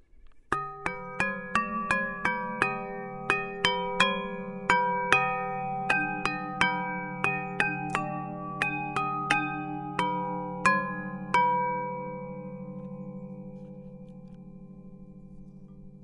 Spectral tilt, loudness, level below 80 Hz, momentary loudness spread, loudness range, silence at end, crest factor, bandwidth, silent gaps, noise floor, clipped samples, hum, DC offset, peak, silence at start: -4.5 dB/octave; -29 LUFS; -56 dBFS; 21 LU; 12 LU; 0 s; 28 dB; 11.5 kHz; none; -52 dBFS; under 0.1%; none; under 0.1%; -2 dBFS; 0.15 s